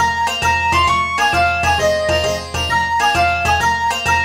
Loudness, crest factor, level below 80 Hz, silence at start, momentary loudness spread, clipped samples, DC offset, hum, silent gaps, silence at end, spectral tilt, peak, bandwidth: -15 LUFS; 12 dB; -32 dBFS; 0 s; 3 LU; under 0.1%; 0.2%; none; none; 0 s; -3 dB/octave; -2 dBFS; 16 kHz